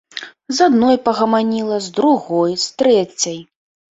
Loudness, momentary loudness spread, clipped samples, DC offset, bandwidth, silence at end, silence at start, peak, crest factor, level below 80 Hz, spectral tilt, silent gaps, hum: -16 LUFS; 10 LU; under 0.1%; under 0.1%; 8.2 kHz; 0.55 s; 0.15 s; -2 dBFS; 16 dB; -58 dBFS; -4 dB/octave; none; none